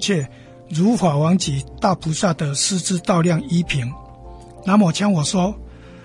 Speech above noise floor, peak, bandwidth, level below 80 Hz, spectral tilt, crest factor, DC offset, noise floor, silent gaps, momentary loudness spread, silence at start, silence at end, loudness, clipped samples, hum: 21 dB; -4 dBFS; 11.5 kHz; -44 dBFS; -5 dB/octave; 16 dB; under 0.1%; -39 dBFS; none; 11 LU; 0 s; 0 s; -19 LUFS; under 0.1%; none